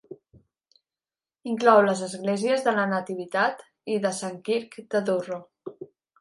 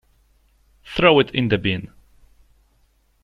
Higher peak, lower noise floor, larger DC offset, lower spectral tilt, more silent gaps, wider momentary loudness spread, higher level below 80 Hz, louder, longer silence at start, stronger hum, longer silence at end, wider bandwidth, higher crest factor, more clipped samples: about the same, -4 dBFS vs -2 dBFS; first, under -90 dBFS vs -61 dBFS; neither; second, -5 dB/octave vs -7 dB/octave; neither; first, 21 LU vs 14 LU; second, -76 dBFS vs -46 dBFS; second, -25 LUFS vs -19 LUFS; second, 0.1 s vs 0.85 s; neither; second, 0.35 s vs 1.4 s; about the same, 11.5 kHz vs 11 kHz; about the same, 22 dB vs 22 dB; neither